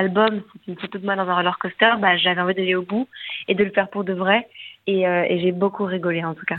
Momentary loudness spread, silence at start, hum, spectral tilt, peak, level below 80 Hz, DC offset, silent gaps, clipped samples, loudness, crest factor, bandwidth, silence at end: 13 LU; 0 s; none; -8.5 dB/octave; -2 dBFS; -66 dBFS; under 0.1%; none; under 0.1%; -21 LUFS; 20 dB; 4.4 kHz; 0 s